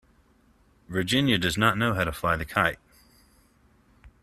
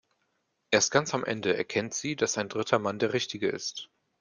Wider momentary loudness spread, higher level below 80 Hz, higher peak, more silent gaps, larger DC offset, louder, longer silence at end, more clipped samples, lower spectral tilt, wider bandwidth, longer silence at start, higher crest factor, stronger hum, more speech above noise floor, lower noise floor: about the same, 8 LU vs 9 LU; first, -50 dBFS vs -70 dBFS; about the same, -4 dBFS vs -6 dBFS; neither; neither; first, -25 LUFS vs -28 LUFS; second, 0.15 s vs 0.35 s; neither; first, -4.5 dB/octave vs -3 dB/octave; first, 15 kHz vs 10.5 kHz; first, 0.9 s vs 0.7 s; about the same, 24 dB vs 24 dB; neither; second, 37 dB vs 48 dB; second, -62 dBFS vs -76 dBFS